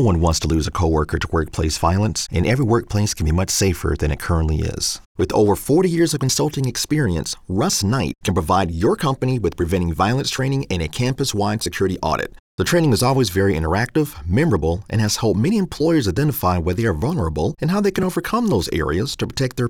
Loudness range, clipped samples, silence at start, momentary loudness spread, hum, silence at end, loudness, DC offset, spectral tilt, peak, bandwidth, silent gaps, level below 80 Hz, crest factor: 2 LU; under 0.1%; 0 s; 5 LU; none; 0 s; -19 LUFS; 0.2%; -5 dB/octave; -4 dBFS; 18.5 kHz; 5.06-5.15 s, 12.39-12.58 s; -34 dBFS; 14 dB